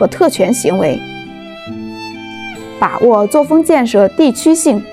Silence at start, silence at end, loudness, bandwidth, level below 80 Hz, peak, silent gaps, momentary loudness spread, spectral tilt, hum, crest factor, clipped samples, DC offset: 0 s; 0 s; -11 LUFS; 15 kHz; -50 dBFS; 0 dBFS; none; 17 LU; -5 dB/octave; none; 12 dB; under 0.1%; 0.3%